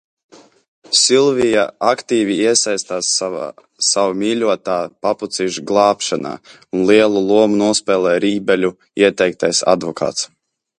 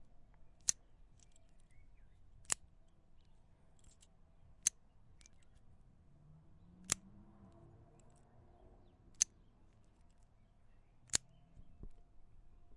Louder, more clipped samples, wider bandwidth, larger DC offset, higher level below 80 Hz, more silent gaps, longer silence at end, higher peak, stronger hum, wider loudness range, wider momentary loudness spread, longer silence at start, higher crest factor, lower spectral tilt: first, -16 LUFS vs -39 LUFS; neither; about the same, 11 kHz vs 11 kHz; neither; first, -58 dBFS vs -64 dBFS; neither; first, 0.55 s vs 0 s; first, 0 dBFS vs -10 dBFS; neither; second, 3 LU vs 6 LU; second, 9 LU vs 26 LU; first, 0.9 s vs 0 s; second, 16 dB vs 40 dB; first, -3 dB/octave vs 0 dB/octave